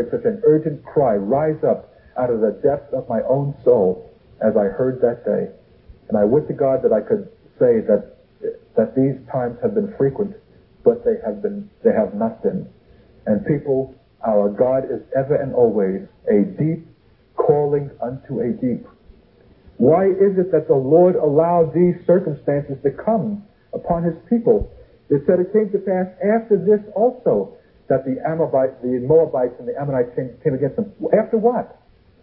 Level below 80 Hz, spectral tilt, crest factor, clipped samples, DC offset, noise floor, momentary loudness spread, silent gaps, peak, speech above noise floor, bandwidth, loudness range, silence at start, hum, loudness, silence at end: -48 dBFS; -14 dB/octave; 18 dB; under 0.1%; under 0.1%; -51 dBFS; 10 LU; none; -2 dBFS; 33 dB; 3.4 kHz; 4 LU; 0 s; none; -19 LUFS; 0.55 s